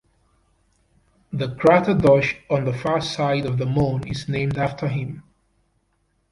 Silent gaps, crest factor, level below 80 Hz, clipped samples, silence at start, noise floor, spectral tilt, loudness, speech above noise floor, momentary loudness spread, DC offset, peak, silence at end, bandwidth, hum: none; 20 dB; -48 dBFS; under 0.1%; 1.3 s; -68 dBFS; -7 dB/octave; -21 LUFS; 47 dB; 12 LU; under 0.1%; -4 dBFS; 1.1 s; 11.5 kHz; none